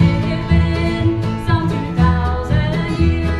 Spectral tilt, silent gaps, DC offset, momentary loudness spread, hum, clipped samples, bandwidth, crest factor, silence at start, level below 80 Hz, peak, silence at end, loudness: -8 dB/octave; none; under 0.1%; 4 LU; none; under 0.1%; 10 kHz; 16 dB; 0 s; -26 dBFS; 0 dBFS; 0 s; -17 LUFS